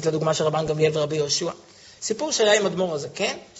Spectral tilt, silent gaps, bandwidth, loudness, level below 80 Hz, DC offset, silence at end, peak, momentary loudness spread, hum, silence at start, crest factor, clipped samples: -3.5 dB/octave; none; 8 kHz; -23 LUFS; -60 dBFS; under 0.1%; 0 s; -4 dBFS; 11 LU; none; 0 s; 18 dB; under 0.1%